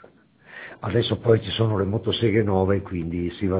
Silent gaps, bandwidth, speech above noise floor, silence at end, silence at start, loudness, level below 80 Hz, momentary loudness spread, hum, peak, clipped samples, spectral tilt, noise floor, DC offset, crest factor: none; 4 kHz; 30 dB; 0 s; 0.5 s; -23 LUFS; -42 dBFS; 13 LU; none; -6 dBFS; under 0.1%; -11 dB/octave; -52 dBFS; under 0.1%; 18 dB